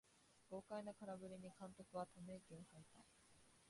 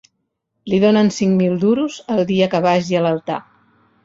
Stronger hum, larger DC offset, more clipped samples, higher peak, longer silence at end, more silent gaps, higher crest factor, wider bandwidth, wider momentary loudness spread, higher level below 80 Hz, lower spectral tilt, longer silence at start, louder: neither; neither; neither; second, -38 dBFS vs -2 dBFS; second, 0 s vs 0.65 s; neither; about the same, 20 dB vs 16 dB; first, 11.5 kHz vs 7.8 kHz; first, 12 LU vs 9 LU; second, -84 dBFS vs -56 dBFS; about the same, -6 dB/octave vs -6.5 dB/octave; second, 0.05 s vs 0.65 s; second, -56 LUFS vs -17 LUFS